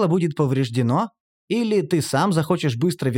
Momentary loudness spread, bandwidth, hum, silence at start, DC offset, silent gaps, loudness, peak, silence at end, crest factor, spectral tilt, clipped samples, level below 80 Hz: 4 LU; 17 kHz; none; 0 s; under 0.1%; 1.20-1.48 s; -21 LUFS; -8 dBFS; 0 s; 14 dB; -6.5 dB/octave; under 0.1%; -64 dBFS